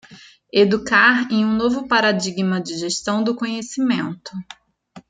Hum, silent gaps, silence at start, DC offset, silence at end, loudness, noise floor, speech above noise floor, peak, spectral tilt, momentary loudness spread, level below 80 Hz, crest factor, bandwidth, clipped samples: none; none; 0.1 s; under 0.1%; 0.1 s; -19 LUFS; -46 dBFS; 27 dB; -2 dBFS; -4.5 dB/octave; 11 LU; -58 dBFS; 18 dB; 9.4 kHz; under 0.1%